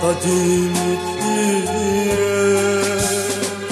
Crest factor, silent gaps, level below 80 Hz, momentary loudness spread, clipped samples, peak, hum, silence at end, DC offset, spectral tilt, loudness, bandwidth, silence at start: 12 dB; none; -46 dBFS; 5 LU; under 0.1%; -4 dBFS; none; 0 s; under 0.1%; -4 dB/octave; -18 LUFS; 15 kHz; 0 s